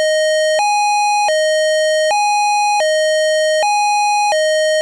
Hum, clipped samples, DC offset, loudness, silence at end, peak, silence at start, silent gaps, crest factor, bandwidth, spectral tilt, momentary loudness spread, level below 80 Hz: none; under 0.1%; under 0.1%; -14 LUFS; 0 s; -12 dBFS; 0 s; none; 2 dB; 11 kHz; 3.5 dB/octave; 0 LU; -70 dBFS